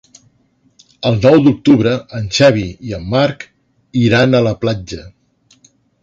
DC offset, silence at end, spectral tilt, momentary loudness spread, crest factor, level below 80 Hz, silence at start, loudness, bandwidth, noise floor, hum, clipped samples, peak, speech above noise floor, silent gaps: under 0.1%; 0.95 s; -6.5 dB/octave; 15 LU; 14 dB; -42 dBFS; 1 s; -13 LUFS; 7.8 kHz; -57 dBFS; none; under 0.1%; 0 dBFS; 44 dB; none